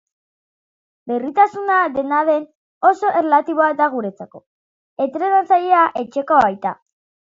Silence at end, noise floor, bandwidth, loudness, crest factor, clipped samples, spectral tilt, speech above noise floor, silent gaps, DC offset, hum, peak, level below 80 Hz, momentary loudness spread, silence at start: 0.65 s; under -90 dBFS; 7.6 kHz; -17 LUFS; 18 dB; under 0.1%; -6 dB/octave; over 73 dB; 2.55-2.81 s, 4.46-4.97 s; under 0.1%; none; 0 dBFS; -64 dBFS; 11 LU; 1.05 s